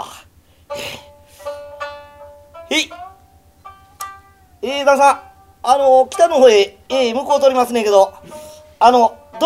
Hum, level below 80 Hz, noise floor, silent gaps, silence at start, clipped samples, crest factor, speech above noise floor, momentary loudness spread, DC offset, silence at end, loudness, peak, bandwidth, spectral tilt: none; -54 dBFS; -49 dBFS; none; 0 s; under 0.1%; 16 dB; 37 dB; 21 LU; under 0.1%; 0 s; -14 LUFS; 0 dBFS; 15.5 kHz; -2.5 dB/octave